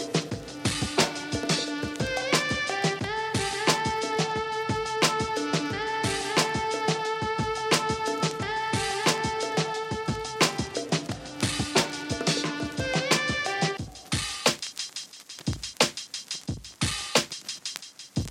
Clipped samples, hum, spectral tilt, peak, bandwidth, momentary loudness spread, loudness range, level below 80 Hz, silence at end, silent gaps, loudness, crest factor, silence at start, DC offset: under 0.1%; none; -3 dB/octave; -6 dBFS; 16.5 kHz; 9 LU; 3 LU; -50 dBFS; 0 s; none; -27 LUFS; 24 dB; 0 s; under 0.1%